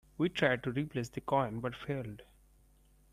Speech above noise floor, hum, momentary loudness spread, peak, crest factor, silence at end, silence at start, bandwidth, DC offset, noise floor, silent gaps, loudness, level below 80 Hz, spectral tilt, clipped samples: 31 dB; none; 9 LU; -14 dBFS; 22 dB; 0.9 s; 0.2 s; 15 kHz; under 0.1%; -65 dBFS; none; -34 LUFS; -62 dBFS; -6.5 dB/octave; under 0.1%